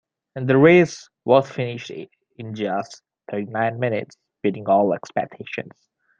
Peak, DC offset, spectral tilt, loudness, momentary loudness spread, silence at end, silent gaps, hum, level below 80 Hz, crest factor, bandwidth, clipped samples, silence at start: -2 dBFS; under 0.1%; -7 dB/octave; -21 LUFS; 21 LU; 0.5 s; none; none; -66 dBFS; 20 dB; 7.6 kHz; under 0.1%; 0.35 s